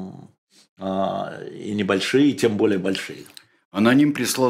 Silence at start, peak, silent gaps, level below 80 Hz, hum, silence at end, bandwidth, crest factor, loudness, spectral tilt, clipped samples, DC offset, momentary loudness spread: 0 s; -4 dBFS; 0.38-0.47 s, 0.69-0.76 s, 3.65-3.71 s; -66 dBFS; none; 0 s; 15.5 kHz; 18 dB; -21 LUFS; -5 dB/octave; under 0.1%; under 0.1%; 16 LU